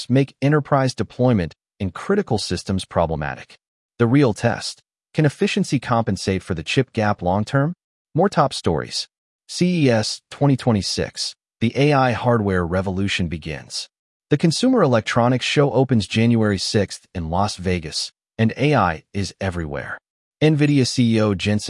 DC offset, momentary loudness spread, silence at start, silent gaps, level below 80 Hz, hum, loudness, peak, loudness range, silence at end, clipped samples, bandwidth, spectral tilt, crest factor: under 0.1%; 11 LU; 0 s; 3.68-3.89 s, 7.84-8.05 s, 9.18-9.39 s, 13.99-14.20 s, 20.10-20.32 s; -50 dBFS; none; -20 LUFS; -2 dBFS; 3 LU; 0 s; under 0.1%; 12 kHz; -6 dB/octave; 16 dB